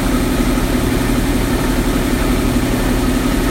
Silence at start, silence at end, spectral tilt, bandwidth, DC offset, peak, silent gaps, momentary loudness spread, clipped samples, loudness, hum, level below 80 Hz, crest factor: 0 s; 0 s; -5.5 dB/octave; 16 kHz; under 0.1%; -2 dBFS; none; 1 LU; under 0.1%; -16 LUFS; none; -20 dBFS; 12 dB